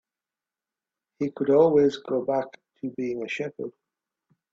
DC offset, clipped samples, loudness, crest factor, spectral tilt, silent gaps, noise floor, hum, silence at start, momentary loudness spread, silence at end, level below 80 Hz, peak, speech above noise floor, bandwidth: under 0.1%; under 0.1%; -25 LUFS; 20 dB; -7 dB/octave; none; under -90 dBFS; none; 1.2 s; 18 LU; 0.85 s; -70 dBFS; -8 dBFS; over 66 dB; 7.6 kHz